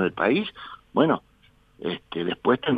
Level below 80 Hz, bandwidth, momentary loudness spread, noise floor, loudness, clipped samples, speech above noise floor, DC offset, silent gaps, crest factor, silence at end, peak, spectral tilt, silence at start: -60 dBFS; 5 kHz; 12 LU; -59 dBFS; -25 LUFS; under 0.1%; 35 dB; under 0.1%; none; 20 dB; 0 s; -6 dBFS; -8 dB/octave; 0 s